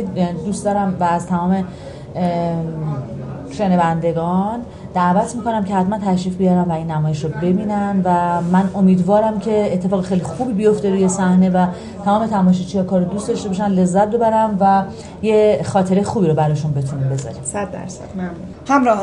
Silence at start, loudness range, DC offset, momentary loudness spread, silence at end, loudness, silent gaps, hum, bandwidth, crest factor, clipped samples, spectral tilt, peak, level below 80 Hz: 0 s; 4 LU; 0.1%; 10 LU; 0 s; -17 LUFS; none; none; 11 kHz; 14 dB; under 0.1%; -7.5 dB/octave; -2 dBFS; -44 dBFS